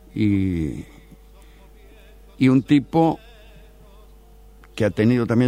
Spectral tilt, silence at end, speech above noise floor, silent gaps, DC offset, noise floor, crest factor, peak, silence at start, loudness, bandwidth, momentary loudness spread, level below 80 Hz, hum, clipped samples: -8 dB/octave; 0 s; 28 dB; none; under 0.1%; -47 dBFS; 16 dB; -6 dBFS; 0.15 s; -20 LUFS; 13 kHz; 17 LU; -46 dBFS; none; under 0.1%